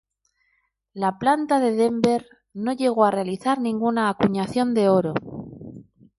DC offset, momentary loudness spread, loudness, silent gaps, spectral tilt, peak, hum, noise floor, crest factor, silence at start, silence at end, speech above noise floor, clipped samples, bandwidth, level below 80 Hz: under 0.1%; 18 LU; -22 LUFS; none; -6.5 dB/octave; -4 dBFS; none; -70 dBFS; 18 dB; 0.95 s; 0.35 s; 49 dB; under 0.1%; 11.5 kHz; -60 dBFS